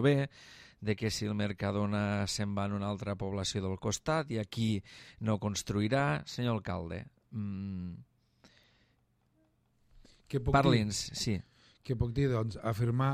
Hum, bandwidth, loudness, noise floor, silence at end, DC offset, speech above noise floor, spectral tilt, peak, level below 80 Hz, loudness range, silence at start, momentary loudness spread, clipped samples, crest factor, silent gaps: none; 15 kHz; -33 LUFS; -73 dBFS; 0 s; under 0.1%; 40 dB; -5.5 dB/octave; -12 dBFS; -54 dBFS; 9 LU; 0 s; 11 LU; under 0.1%; 20 dB; none